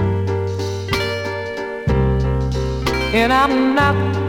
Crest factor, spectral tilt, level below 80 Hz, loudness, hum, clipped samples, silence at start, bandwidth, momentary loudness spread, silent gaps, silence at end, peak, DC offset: 16 dB; -6.5 dB/octave; -28 dBFS; -18 LUFS; none; under 0.1%; 0 s; 17 kHz; 9 LU; none; 0 s; -2 dBFS; under 0.1%